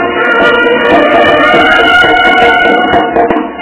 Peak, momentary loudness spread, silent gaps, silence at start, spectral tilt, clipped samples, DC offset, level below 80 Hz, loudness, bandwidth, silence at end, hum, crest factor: 0 dBFS; 4 LU; none; 0 s; -7.5 dB/octave; 4%; under 0.1%; -34 dBFS; -6 LUFS; 4 kHz; 0 s; none; 6 dB